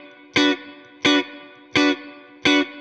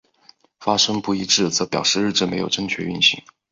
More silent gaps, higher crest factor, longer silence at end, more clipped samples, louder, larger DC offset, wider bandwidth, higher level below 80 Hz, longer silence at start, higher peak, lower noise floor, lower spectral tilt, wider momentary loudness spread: neither; about the same, 18 dB vs 18 dB; second, 0 s vs 0.3 s; neither; about the same, -20 LUFS vs -19 LUFS; neither; first, 9 kHz vs 7.8 kHz; second, -62 dBFS vs -56 dBFS; second, 0.35 s vs 0.6 s; about the same, -4 dBFS vs -2 dBFS; second, -42 dBFS vs -54 dBFS; about the same, -3 dB/octave vs -2.5 dB/octave; first, 10 LU vs 7 LU